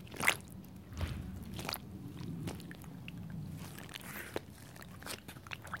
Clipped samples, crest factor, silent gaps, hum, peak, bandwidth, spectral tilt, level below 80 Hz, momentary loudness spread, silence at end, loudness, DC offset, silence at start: under 0.1%; 30 dB; none; none; -12 dBFS; 17 kHz; -3.5 dB/octave; -56 dBFS; 11 LU; 0 s; -42 LUFS; under 0.1%; 0 s